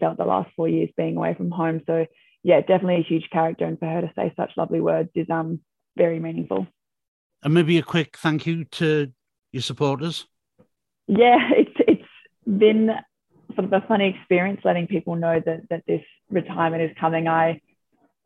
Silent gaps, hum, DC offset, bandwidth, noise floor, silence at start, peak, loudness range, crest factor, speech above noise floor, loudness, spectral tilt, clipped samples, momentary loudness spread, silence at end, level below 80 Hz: 7.08-7.30 s; none; under 0.1%; 12 kHz; -67 dBFS; 0 s; -4 dBFS; 5 LU; 18 dB; 46 dB; -22 LUFS; -7 dB/octave; under 0.1%; 11 LU; 0.65 s; -68 dBFS